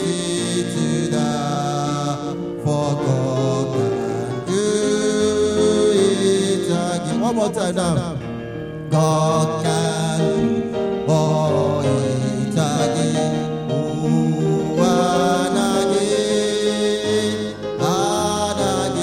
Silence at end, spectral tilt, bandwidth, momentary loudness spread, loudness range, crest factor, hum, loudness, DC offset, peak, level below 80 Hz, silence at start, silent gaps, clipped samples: 0 s; -5.5 dB/octave; 15.5 kHz; 6 LU; 3 LU; 14 dB; none; -19 LUFS; under 0.1%; -4 dBFS; -48 dBFS; 0 s; none; under 0.1%